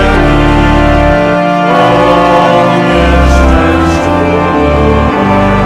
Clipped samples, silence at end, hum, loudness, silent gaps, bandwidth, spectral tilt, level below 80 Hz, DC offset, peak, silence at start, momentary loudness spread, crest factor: 2%; 0 s; none; -7 LUFS; none; 12 kHz; -6.5 dB/octave; -14 dBFS; under 0.1%; 0 dBFS; 0 s; 3 LU; 6 dB